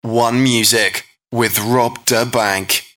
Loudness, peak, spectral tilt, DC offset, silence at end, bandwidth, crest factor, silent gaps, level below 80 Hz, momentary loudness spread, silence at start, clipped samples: -15 LUFS; -2 dBFS; -3 dB/octave; under 0.1%; 0.1 s; 19 kHz; 14 dB; none; -56 dBFS; 7 LU; 0.05 s; under 0.1%